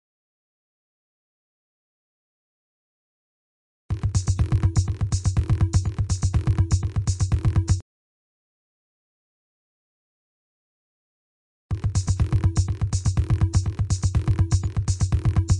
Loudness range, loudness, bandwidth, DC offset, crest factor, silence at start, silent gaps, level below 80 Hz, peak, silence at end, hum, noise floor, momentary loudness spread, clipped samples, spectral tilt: 9 LU; -24 LUFS; 10.5 kHz; under 0.1%; 16 dB; 3.9 s; 7.82-11.69 s; -32 dBFS; -8 dBFS; 0 s; none; under -90 dBFS; 4 LU; under 0.1%; -6 dB/octave